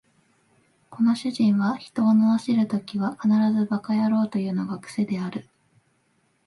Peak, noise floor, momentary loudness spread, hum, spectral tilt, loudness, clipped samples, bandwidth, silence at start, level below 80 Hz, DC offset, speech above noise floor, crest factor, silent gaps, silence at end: -10 dBFS; -67 dBFS; 9 LU; none; -7.5 dB/octave; -23 LUFS; under 0.1%; 11.5 kHz; 0.9 s; -70 dBFS; under 0.1%; 45 dB; 14 dB; none; 1.05 s